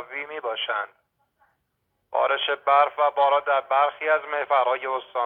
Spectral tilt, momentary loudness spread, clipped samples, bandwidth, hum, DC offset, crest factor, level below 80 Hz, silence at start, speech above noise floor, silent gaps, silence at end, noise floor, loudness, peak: -3.5 dB/octave; 10 LU; under 0.1%; 4.3 kHz; none; under 0.1%; 18 dB; -78 dBFS; 0 s; 52 dB; none; 0 s; -75 dBFS; -23 LUFS; -6 dBFS